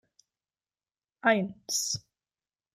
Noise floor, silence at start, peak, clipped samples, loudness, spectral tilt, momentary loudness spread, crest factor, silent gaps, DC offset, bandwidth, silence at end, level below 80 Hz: under -90 dBFS; 1.25 s; -10 dBFS; under 0.1%; -29 LUFS; -2.5 dB/octave; 6 LU; 24 dB; none; under 0.1%; 15.5 kHz; 0.75 s; -72 dBFS